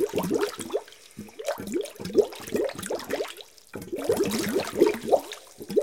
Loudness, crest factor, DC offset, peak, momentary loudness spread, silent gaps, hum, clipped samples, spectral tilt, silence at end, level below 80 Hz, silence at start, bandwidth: -28 LUFS; 22 dB; 0.1%; -6 dBFS; 17 LU; none; none; under 0.1%; -4.5 dB/octave; 0 s; -60 dBFS; 0 s; 17 kHz